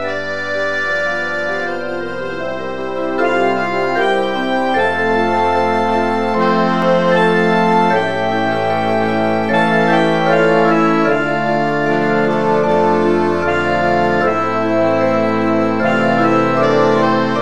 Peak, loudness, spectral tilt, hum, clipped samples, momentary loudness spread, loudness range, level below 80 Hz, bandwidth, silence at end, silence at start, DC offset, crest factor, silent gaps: -2 dBFS; -15 LUFS; -6.5 dB/octave; none; under 0.1%; 6 LU; 4 LU; -50 dBFS; 11.5 kHz; 0 s; 0 s; 3%; 14 dB; none